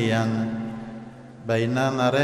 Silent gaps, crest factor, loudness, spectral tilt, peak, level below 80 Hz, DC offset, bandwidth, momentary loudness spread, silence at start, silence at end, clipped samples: none; 16 dB; -25 LUFS; -6.5 dB/octave; -10 dBFS; -58 dBFS; under 0.1%; 13 kHz; 17 LU; 0 s; 0 s; under 0.1%